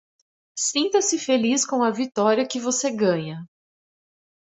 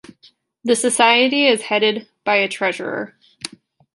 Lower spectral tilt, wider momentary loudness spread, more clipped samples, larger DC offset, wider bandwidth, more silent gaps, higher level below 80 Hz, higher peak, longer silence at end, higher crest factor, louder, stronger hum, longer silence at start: about the same, -3 dB/octave vs -2 dB/octave; second, 7 LU vs 20 LU; neither; neither; second, 8.4 kHz vs 12 kHz; neither; about the same, -70 dBFS vs -70 dBFS; second, -6 dBFS vs -2 dBFS; first, 1.1 s vs 0.5 s; about the same, 18 dB vs 18 dB; second, -22 LUFS vs -17 LUFS; neither; about the same, 0.55 s vs 0.65 s